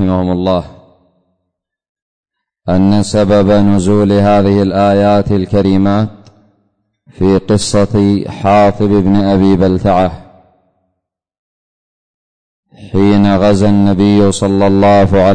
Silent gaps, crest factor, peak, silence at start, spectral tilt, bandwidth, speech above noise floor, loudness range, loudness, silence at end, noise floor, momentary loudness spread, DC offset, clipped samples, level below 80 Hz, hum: 1.89-1.95 s, 2.02-2.24 s, 11.39-12.63 s; 10 dB; -2 dBFS; 0 s; -7 dB/octave; 9.6 kHz; 63 dB; 6 LU; -10 LUFS; 0 s; -72 dBFS; 6 LU; under 0.1%; under 0.1%; -36 dBFS; none